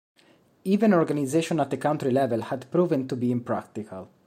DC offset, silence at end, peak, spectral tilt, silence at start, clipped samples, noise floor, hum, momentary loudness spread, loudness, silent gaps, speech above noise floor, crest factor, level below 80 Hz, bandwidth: under 0.1%; 0.2 s; -8 dBFS; -7 dB/octave; 0.65 s; under 0.1%; -60 dBFS; none; 13 LU; -25 LUFS; none; 35 dB; 16 dB; -70 dBFS; 15 kHz